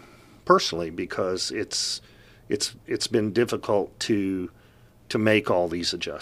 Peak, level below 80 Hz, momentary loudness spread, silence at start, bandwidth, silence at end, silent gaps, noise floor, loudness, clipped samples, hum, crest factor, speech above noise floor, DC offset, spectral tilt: -2 dBFS; -58 dBFS; 10 LU; 0.45 s; 15 kHz; 0 s; none; -54 dBFS; -25 LUFS; under 0.1%; 60 Hz at -55 dBFS; 24 dB; 29 dB; under 0.1%; -4 dB/octave